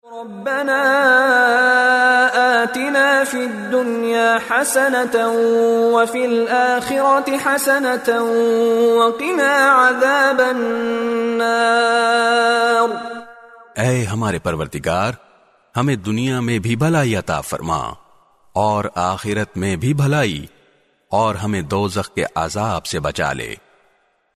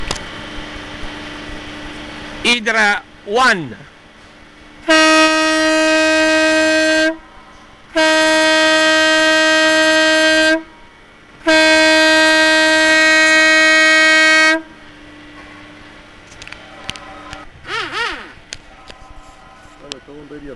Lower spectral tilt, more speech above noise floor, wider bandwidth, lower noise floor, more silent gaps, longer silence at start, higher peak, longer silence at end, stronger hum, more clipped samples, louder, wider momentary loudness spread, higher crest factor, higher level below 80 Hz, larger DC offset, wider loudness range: first, -4.5 dB/octave vs -1.5 dB/octave; first, 44 dB vs 27 dB; about the same, 13.5 kHz vs 12.5 kHz; first, -60 dBFS vs -43 dBFS; neither; about the same, 0.05 s vs 0 s; about the same, -2 dBFS vs -2 dBFS; first, 0.8 s vs 0 s; neither; neither; second, -16 LUFS vs -11 LUFS; second, 10 LU vs 24 LU; about the same, 14 dB vs 12 dB; about the same, -48 dBFS vs -44 dBFS; neither; second, 7 LU vs 17 LU